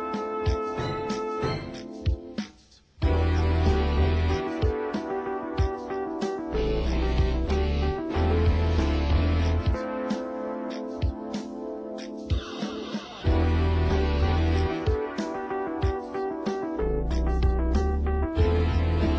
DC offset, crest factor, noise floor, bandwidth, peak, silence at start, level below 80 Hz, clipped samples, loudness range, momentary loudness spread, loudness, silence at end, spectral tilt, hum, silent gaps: under 0.1%; 14 dB; -55 dBFS; 8 kHz; -10 dBFS; 0 s; -28 dBFS; under 0.1%; 4 LU; 9 LU; -27 LUFS; 0 s; -7.5 dB/octave; none; none